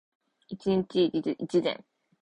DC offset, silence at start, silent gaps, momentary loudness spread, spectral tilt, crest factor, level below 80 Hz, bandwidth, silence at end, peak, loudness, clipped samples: under 0.1%; 0.5 s; none; 11 LU; -7 dB/octave; 16 dB; -66 dBFS; 9.4 kHz; 0.45 s; -14 dBFS; -28 LUFS; under 0.1%